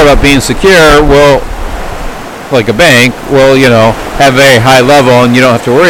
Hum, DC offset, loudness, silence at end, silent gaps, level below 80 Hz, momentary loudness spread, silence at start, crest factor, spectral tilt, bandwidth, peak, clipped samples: none; under 0.1%; -4 LUFS; 0 s; none; -18 dBFS; 16 LU; 0 s; 4 dB; -4.5 dB/octave; 19 kHz; 0 dBFS; 9%